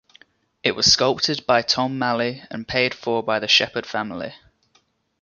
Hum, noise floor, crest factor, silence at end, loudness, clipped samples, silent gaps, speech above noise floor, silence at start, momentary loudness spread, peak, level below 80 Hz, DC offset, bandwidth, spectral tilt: none; -64 dBFS; 20 dB; 0.85 s; -20 LUFS; under 0.1%; none; 42 dB; 0.65 s; 12 LU; -2 dBFS; -54 dBFS; under 0.1%; 10.5 kHz; -2.5 dB/octave